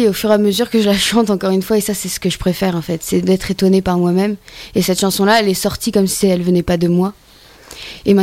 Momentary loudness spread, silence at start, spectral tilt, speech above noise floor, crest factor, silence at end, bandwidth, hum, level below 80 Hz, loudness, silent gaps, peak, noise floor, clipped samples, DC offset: 7 LU; 0 s; -5 dB/octave; 25 dB; 14 dB; 0 s; 16.5 kHz; none; -40 dBFS; -15 LUFS; none; 0 dBFS; -40 dBFS; under 0.1%; under 0.1%